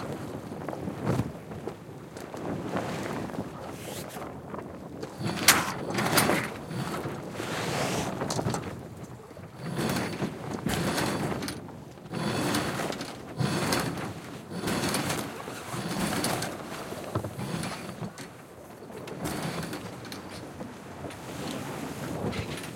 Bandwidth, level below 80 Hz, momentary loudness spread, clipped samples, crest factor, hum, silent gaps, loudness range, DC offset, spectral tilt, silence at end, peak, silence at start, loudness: 17 kHz; -56 dBFS; 14 LU; under 0.1%; 30 dB; none; none; 9 LU; under 0.1%; -4 dB/octave; 0 s; -2 dBFS; 0 s; -32 LUFS